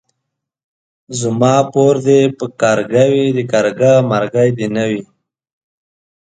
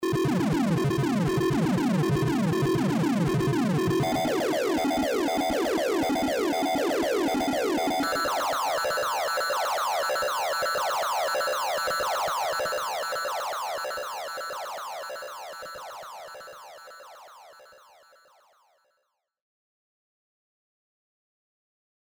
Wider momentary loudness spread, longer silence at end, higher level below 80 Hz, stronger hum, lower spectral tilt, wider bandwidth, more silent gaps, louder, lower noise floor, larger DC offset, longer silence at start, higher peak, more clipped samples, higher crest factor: second, 8 LU vs 14 LU; second, 1.2 s vs 4.4 s; about the same, -56 dBFS vs -56 dBFS; neither; about the same, -6 dB/octave vs -5 dB/octave; second, 9.4 kHz vs over 20 kHz; neither; first, -13 LUFS vs -26 LUFS; about the same, -76 dBFS vs -77 dBFS; neither; first, 1.1 s vs 0 s; first, 0 dBFS vs -16 dBFS; neither; about the same, 14 dB vs 10 dB